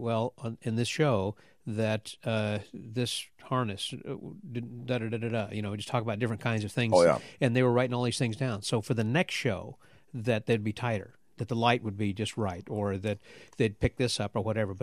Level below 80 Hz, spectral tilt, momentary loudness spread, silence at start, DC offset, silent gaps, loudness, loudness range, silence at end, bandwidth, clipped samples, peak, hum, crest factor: -56 dBFS; -5.5 dB/octave; 12 LU; 0 s; under 0.1%; none; -30 LUFS; 6 LU; 0.05 s; 13.5 kHz; under 0.1%; -8 dBFS; none; 22 dB